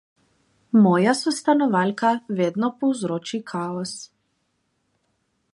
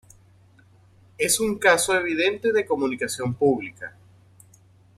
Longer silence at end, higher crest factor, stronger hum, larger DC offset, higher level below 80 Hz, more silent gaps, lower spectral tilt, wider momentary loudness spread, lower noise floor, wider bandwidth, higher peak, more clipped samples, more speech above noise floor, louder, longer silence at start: first, 1.5 s vs 1.1 s; about the same, 18 dB vs 20 dB; neither; neither; second, -72 dBFS vs -60 dBFS; neither; first, -5.5 dB/octave vs -3 dB/octave; about the same, 12 LU vs 10 LU; first, -71 dBFS vs -55 dBFS; second, 11.5 kHz vs 16 kHz; about the same, -4 dBFS vs -4 dBFS; neither; first, 51 dB vs 32 dB; about the same, -22 LUFS vs -22 LUFS; second, 0.75 s vs 1.2 s